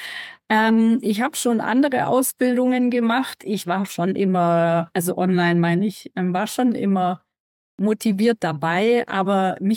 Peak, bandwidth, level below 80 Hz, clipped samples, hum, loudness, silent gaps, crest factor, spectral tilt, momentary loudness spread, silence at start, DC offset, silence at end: -6 dBFS; 17.5 kHz; -70 dBFS; under 0.1%; none; -20 LUFS; 7.40-7.78 s; 14 dB; -5.5 dB/octave; 6 LU; 0 s; under 0.1%; 0 s